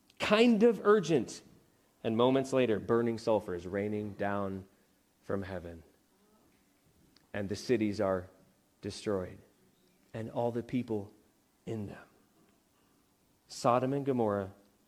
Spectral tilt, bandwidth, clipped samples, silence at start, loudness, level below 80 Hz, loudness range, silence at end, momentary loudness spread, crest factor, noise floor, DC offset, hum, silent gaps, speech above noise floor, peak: -6 dB/octave; 15 kHz; under 0.1%; 0.2 s; -32 LUFS; -68 dBFS; 10 LU; 0.35 s; 19 LU; 22 dB; -70 dBFS; under 0.1%; none; none; 39 dB; -12 dBFS